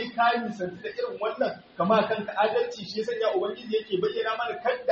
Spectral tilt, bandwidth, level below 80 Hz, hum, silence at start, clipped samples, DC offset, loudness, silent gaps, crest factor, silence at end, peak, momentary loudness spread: -3 dB/octave; 7.2 kHz; -70 dBFS; none; 0 s; under 0.1%; under 0.1%; -27 LUFS; none; 16 dB; 0 s; -10 dBFS; 9 LU